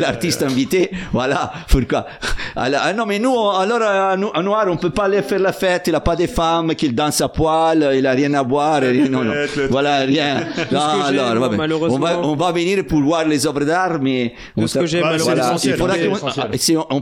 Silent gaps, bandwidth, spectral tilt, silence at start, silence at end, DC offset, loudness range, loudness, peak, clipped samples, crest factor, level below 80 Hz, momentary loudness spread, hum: none; 17 kHz; -5 dB/octave; 0 s; 0 s; under 0.1%; 2 LU; -17 LUFS; 0 dBFS; under 0.1%; 16 dB; -34 dBFS; 4 LU; none